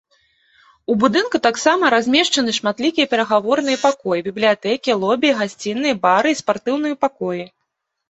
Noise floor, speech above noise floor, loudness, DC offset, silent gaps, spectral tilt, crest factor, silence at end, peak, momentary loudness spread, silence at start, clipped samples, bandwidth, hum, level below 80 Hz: -75 dBFS; 58 dB; -17 LUFS; under 0.1%; none; -3.5 dB/octave; 18 dB; 0.65 s; 0 dBFS; 7 LU; 0.9 s; under 0.1%; 8.2 kHz; none; -62 dBFS